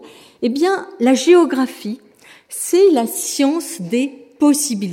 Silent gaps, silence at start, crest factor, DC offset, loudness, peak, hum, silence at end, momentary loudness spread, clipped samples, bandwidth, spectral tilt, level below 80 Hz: none; 0 s; 16 dB; under 0.1%; -16 LUFS; -2 dBFS; none; 0 s; 13 LU; under 0.1%; 16.5 kHz; -3.5 dB/octave; -72 dBFS